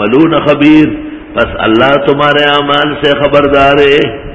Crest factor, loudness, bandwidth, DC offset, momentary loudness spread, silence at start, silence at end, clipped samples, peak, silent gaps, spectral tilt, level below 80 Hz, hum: 8 dB; -8 LUFS; 8 kHz; 0.7%; 7 LU; 0 s; 0 s; 2%; 0 dBFS; none; -7 dB/octave; -32 dBFS; none